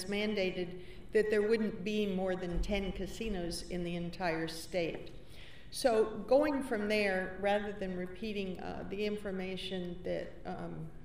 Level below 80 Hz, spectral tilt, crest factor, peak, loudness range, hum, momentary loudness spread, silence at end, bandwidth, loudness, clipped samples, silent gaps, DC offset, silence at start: -50 dBFS; -5.5 dB/octave; 18 dB; -16 dBFS; 5 LU; none; 13 LU; 0 s; 15.5 kHz; -35 LUFS; under 0.1%; none; 0.4%; 0 s